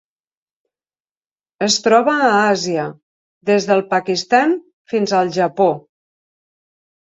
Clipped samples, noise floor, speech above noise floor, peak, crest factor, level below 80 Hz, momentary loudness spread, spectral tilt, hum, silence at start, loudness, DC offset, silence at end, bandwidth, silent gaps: under 0.1%; under -90 dBFS; over 74 dB; -2 dBFS; 16 dB; -66 dBFS; 10 LU; -4 dB/octave; none; 1.6 s; -16 LUFS; under 0.1%; 1.25 s; 8 kHz; 3.03-3.41 s, 4.73-4.85 s